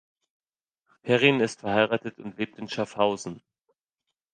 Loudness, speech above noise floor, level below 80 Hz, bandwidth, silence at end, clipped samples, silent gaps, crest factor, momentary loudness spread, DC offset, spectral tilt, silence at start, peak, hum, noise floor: -25 LUFS; 59 dB; -68 dBFS; 9.6 kHz; 0.95 s; under 0.1%; none; 24 dB; 16 LU; under 0.1%; -5 dB/octave; 1.05 s; -4 dBFS; none; -85 dBFS